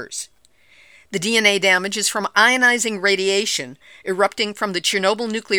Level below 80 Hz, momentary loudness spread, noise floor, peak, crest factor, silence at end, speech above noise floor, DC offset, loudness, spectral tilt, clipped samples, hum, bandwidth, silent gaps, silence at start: -68 dBFS; 15 LU; -54 dBFS; 0 dBFS; 20 dB; 0 s; 35 dB; 0.1%; -17 LUFS; -1.5 dB/octave; under 0.1%; none; over 20 kHz; none; 0 s